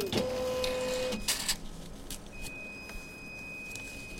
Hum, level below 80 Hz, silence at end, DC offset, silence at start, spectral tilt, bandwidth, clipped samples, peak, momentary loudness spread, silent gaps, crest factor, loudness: none; -48 dBFS; 0 s; under 0.1%; 0 s; -2.5 dB/octave; 16.5 kHz; under 0.1%; -16 dBFS; 12 LU; none; 20 dB; -35 LUFS